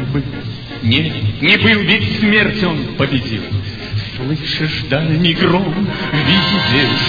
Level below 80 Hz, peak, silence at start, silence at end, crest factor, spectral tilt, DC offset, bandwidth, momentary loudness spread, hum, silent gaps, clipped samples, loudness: -38 dBFS; 0 dBFS; 0 s; 0 s; 16 dB; -7 dB/octave; under 0.1%; 5 kHz; 11 LU; none; none; under 0.1%; -14 LUFS